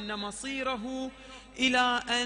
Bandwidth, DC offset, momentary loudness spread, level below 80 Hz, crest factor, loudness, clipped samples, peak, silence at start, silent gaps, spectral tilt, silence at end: 10 kHz; under 0.1%; 17 LU; -58 dBFS; 20 dB; -29 LUFS; under 0.1%; -12 dBFS; 0 s; none; -2 dB/octave; 0 s